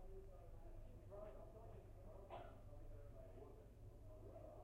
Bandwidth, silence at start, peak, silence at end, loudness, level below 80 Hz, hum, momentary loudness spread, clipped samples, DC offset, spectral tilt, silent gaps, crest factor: 15 kHz; 0 s; -42 dBFS; 0 s; -61 LUFS; -60 dBFS; none; 4 LU; under 0.1%; under 0.1%; -7.5 dB/octave; none; 14 dB